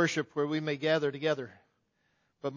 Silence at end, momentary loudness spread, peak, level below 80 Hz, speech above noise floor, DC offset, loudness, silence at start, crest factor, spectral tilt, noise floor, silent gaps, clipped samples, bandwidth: 0 s; 9 LU; -14 dBFS; -78 dBFS; 44 dB; under 0.1%; -31 LUFS; 0 s; 18 dB; -5 dB/octave; -75 dBFS; none; under 0.1%; 7.6 kHz